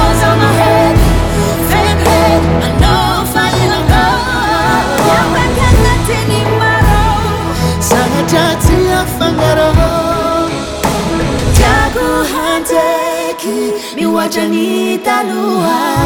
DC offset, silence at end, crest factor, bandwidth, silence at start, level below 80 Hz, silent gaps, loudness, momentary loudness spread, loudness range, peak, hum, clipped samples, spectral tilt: under 0.1%; 0 s; 10 dB; over 20 kHz; 0 s; -20 dBFS; none; -11 LUFS; 5 LU; 3 LU; 0 dBFS; none; under 0.1%; -5 dB/octave